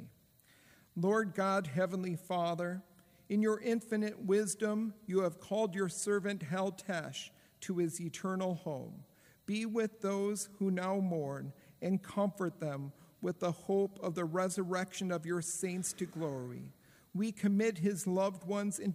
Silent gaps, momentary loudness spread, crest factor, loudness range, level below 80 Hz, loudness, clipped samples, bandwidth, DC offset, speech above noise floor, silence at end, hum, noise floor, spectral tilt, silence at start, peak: none; 11 LU; 16 dB; 3 LU; -78 dBFS; -36 LUFS; under 0.1%; 15.5 kHz; under 0.1%; 31 dB; 0 s; none; -66 dBFS; -5.5 dB/octave; 0 s; -20 dBFS